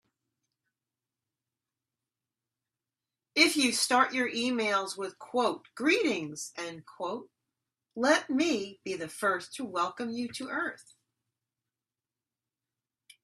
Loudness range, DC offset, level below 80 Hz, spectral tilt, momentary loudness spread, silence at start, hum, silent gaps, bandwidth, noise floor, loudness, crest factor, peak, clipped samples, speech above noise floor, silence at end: 9 LU; under 0.1%; -78 dBFS; -2 dB/octave; 13 LU; 3.35 s; none; none; 13.5 kHz; under -90 dBFS; -29 LUFS; 24 dB; -8 dBFS; under 0.1%; over 60 dB; 2.4 s